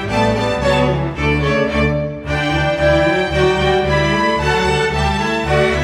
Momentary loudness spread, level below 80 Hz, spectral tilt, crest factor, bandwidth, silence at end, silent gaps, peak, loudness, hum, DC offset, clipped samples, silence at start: 4 LU; -28 dBFS; -6 dB/octave; 12 dB; 12.5 kHz; 0 s; none; -2 dBFS; -16 LUFS; none; under 0.1%; under 0.1%; 0 s